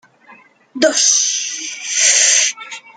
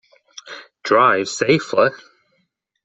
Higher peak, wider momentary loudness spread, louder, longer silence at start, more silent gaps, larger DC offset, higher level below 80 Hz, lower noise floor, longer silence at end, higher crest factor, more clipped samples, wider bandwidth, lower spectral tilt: about the same, 0 dBFS vs -2 dBFS; second, 13 LU vs 21 LU; first, -12 LUFS vs -17 LUFS; second, 0.3 s vs 0.45 s; neither; neither; second, -72 dBFS vs -62 dBFS; second, -46 dBFS vs -69 dBFS; second, 0.05 s vs 0.9 s; about the same, 16 dB vs 18 dB; neither; first, 11 kHz vs 8.2 kHz; second, 2 dB/octave vs -4.5 dB/octave